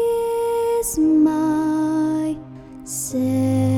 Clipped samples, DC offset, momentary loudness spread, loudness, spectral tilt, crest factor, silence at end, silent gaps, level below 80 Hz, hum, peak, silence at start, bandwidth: under 0.1%; under 0.1%; 12 LU; -20 LUFS; -6.5 dB/octave; 12 dB; 0 s; none; -48 dBFS; none; -8 dBFS; 0 s; 16.5 kHz